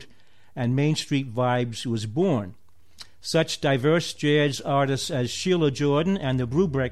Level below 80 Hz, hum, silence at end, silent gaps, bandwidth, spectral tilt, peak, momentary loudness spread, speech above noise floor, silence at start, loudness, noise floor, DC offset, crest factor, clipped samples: -54 dBFS; none; 0 s; none; 14 kHz; -5.5 dB/octave; -10 dBFS; 6 LU; 36 dB; 0 s; -24 LUFS; -59 dBFS; 0.5%; 14 dB; under 0.1%